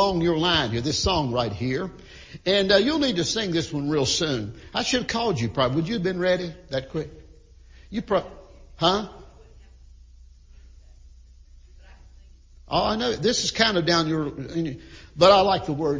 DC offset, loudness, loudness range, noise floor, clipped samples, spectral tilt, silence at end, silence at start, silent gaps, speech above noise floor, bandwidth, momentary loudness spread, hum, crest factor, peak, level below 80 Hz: under 0.1%; -23 LUFS; 8 LU; -49 dBFS; under 0.1%; -4.5 dB/octave; 0 s; 0 s; none; 26 dB; 7.6 kHz; 14 LU; none; 22 dB; -2 dBFS; -46 dBFS